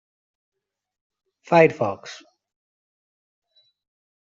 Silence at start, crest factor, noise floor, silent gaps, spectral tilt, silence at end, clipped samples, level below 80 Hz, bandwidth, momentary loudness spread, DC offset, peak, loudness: 1.5 s; 24 dB; under -90 dBFS; none; -6.5 dB/octave; 2.15 s; under 0.1%; -70 dBFS; 7.6 kHz; 24 LU; under 0.1%; -2 dBFS; -19 LUFS